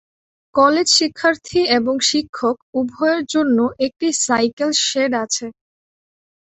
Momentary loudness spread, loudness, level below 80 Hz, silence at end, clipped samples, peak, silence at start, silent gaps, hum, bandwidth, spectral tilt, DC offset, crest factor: 9 LU; -17 LUFS; -58 dBFS; 1 s; under 0.1%; -2 dBFS; 0.55 s; 2.29-2.33 s, 2.62-2.73 s, 4.53-4.57 s; none; 8.4 kHz; -2 dB/octave; under 0.1%; 16 dB